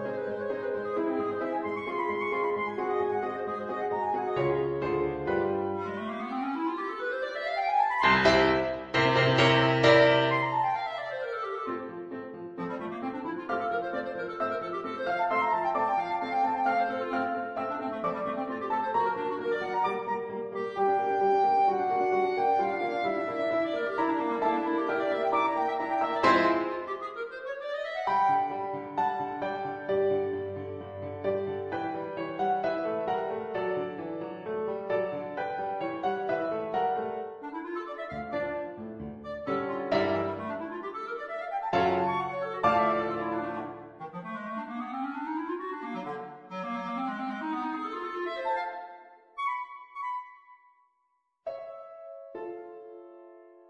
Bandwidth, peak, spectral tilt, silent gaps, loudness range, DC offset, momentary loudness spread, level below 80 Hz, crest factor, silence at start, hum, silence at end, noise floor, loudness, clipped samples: 9.4 kHz; -8 dBFS; -6 dB/octave; none; 10 LU; under 0.1%; 14 LU; -62 dBFS; 22 dB; 0 s; none; 0.2 s; -75 dBFS; -29 LUFS; under 0.1%